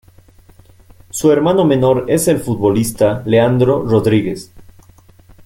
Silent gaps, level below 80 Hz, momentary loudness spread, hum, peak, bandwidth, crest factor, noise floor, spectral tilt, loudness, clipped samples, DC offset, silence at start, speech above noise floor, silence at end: none; -44 dBFS; 5 LU; none; -2 dBFS; 17 kHz; 14 dB; -45 dBFS; -6 dB/octave; -14 LUFS; under 0.1%; under 0.1%; 1.15 s; 32 dB; 0.85 s